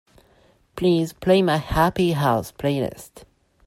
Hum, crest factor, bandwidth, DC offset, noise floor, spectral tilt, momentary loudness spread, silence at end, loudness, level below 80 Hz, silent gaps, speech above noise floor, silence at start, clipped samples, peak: none; 18 dB; 16 kHz; under 0.1%; -58 dBFS; -6.5 dB/octave; 10 LU; 0.45 s; -21 LUFS; -44 dBFS; none; 37 dB; 0.75 s; under 0.1%; -4 dBFS